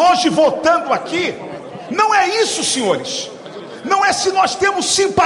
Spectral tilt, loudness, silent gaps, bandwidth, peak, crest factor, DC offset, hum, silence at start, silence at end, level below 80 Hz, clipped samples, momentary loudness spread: -2 dB/octave; -15 LUFS; none; 15.5 kHz; -2 dBFS; 14 dB; under 0.1%; none; 0 s; 0 s; -54 dBFS; under 0.1%; 16 LU